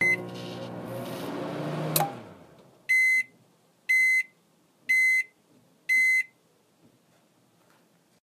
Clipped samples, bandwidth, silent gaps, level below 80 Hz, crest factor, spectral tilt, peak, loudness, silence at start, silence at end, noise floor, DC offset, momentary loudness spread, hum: under 0.1%; 15.5 kHz; none; -76 dBFS; 22 dB; -3 dB/octave; -6 dBFS; -24 LUFS; 0 s; 1.95 s; -65 dBFS; under 0.1%; 18 LU; none